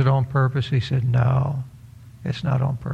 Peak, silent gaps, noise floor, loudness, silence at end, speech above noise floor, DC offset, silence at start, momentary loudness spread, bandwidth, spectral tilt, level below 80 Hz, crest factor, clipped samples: -6 dBFS; none; -44 dBFS; -22 LUFS; 0 s; 23 dB; under 0.1%; 0 s; 11 LU; 6.4 kHz; -8.5 dB/octave; -48 dBFS; 16 dB; under 0.1%